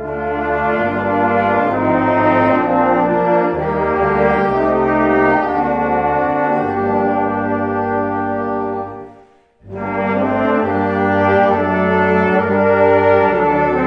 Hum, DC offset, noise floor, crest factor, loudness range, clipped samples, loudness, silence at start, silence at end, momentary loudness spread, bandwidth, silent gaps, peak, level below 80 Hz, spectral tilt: none; under 0.1%; -47 dBFS; 14 dB; 6 LU; under 0.1%; -15 LUFS; 0 s; 0 s; 7 LU; 6.2 kHz; none; 0 dBFS; -42 dBFS; -9 dB/octave